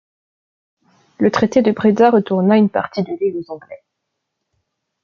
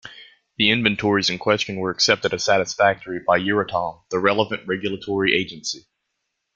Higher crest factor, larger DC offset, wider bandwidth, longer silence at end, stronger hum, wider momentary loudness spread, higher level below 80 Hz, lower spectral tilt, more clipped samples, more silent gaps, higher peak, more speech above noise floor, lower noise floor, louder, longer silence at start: about the same, 18 dB vs 20 dB; neither; second, 7.2 kHz vs 9 kHz; first, 1.25 s vs 0.75 s; neither; first, 12 LU vs 9 LU; about the same, -60 dBFS vs -58 dBFS; first, -7.5 dB/octave vs -3.5 dB/octave; neither; neither; about the same, 0 dBFS vs -2 dBFS; first, 61 dB vs 56 dB; about the same, -76 dBFS vs -77 dBFS; first, -15 LUFS vs -20 LUFS; first, 1.2 s vs 0.05 s